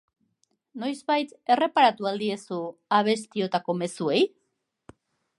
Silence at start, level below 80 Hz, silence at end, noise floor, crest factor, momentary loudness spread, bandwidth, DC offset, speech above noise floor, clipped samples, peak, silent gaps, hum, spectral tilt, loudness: 0.75 s; -76 dBFS; 1.1 s; -77 dBFS; 22 dB; 12 LU; 11.5 kHz; under 0.1%; 52 dB; under 0.1%; -6 dBFS; none; none; -5 dB/octave; -25 LUFS